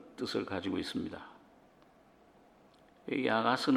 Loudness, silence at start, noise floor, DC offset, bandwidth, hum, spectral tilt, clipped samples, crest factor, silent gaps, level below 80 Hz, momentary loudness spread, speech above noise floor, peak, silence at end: -34 LUFS; 0 s; -63 dBFS; under 0.1%; 13.5 kHz; none; -5 dB/octave; under 0.1%; 22 dB; none; -72 dBFS; 20 LU; 30 dB; -14 dBFS; 0 s